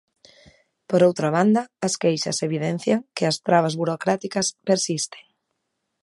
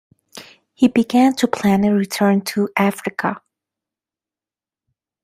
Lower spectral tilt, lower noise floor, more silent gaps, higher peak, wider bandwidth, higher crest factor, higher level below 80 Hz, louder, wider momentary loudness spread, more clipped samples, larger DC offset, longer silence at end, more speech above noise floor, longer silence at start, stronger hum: about the same, -4.5 dB/octave vs -5.5 dB/octave; second, -77 dBFS vs under -90 dBFS; neither; about the same, -4 dBFS vs -2 dBFS; second, 11.5 kHz vs 15.5 kHz; about the same, 20 dB vs 18 dB; second, -68 dBFS vs -58 dBFS; second, -22 LUFS vs -17 LUFS; about the same, 6 LU vs 8 LU; neither; neither; second, 0.8 s vs 1.85 s; second, 56 dB vs over 73 dB; first, 0.9 s vs 0.35 s; neither